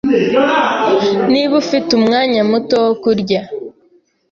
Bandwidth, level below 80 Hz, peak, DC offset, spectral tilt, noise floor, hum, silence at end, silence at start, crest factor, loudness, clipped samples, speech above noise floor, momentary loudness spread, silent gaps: 7.4 kHz; -54 dBFS; -2 dBFS; under 0.1%; -5.5 dB/octave; -53 dBFS; none; 0.6 s; 0.05 s; 12 dB; -13 LUFS; under 0.1%; 40 dB; 6 LU; none